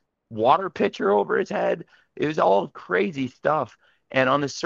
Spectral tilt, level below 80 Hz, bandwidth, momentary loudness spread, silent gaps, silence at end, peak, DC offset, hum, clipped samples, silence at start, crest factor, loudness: -5.5 dB/octave; -66 dBFS; 7.6 kHz; 7 LU; none; 0 s; -4 dBFS; under 0.1%; none; under 0.1%; 0.3 s; 18 dB; -23 LUFS